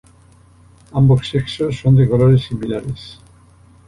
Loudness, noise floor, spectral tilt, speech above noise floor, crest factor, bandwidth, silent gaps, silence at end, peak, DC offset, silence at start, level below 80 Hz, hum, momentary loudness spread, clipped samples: -16 LUFS; -48 dBFS; -8.5 dB/octave; 33 dB; 14 dB; 11 kHz; none; 0.75 s; -2 dBFS; under 0.1%; 0.95 s; -40 dBFS; none; 15 LU; under 0.1%